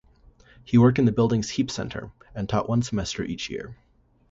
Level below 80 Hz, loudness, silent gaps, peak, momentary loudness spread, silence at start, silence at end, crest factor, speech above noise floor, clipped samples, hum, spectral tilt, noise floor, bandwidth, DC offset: -48 dBFS; -24 LUFS; none; -6 dBFS; 17 LU; 0.65 s; 0.55 s; 18 dB; 31 dB; under 0.1%; none; -6.5 dB/octave; -55 dBFS; 8 kHz; under 0.1%